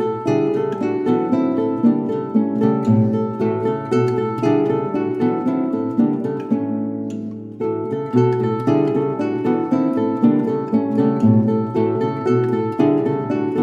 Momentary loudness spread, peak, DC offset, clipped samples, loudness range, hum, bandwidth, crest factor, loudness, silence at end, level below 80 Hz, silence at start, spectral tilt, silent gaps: 5 LU; -4 dBFS; under 0.1%; under 0.1%; 3 LU; none; 7.4 kHz; 16 dB; -19 LUFS; 0 s; -64 dBFS; 0 s; -9.5 dB/octave; none